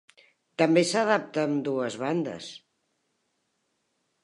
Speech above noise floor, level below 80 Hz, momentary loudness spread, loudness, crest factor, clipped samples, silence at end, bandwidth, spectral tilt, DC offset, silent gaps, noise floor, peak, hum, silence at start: 50 dB; -78 dBFS; 17 LU; -26 LUFS; 22 dB; under 0.1%; 1.65 s; 11.5 kHz; -5 dB/octave; under 0.1%; none; -76 dBFS; -8 dBFS; none; 0.6 s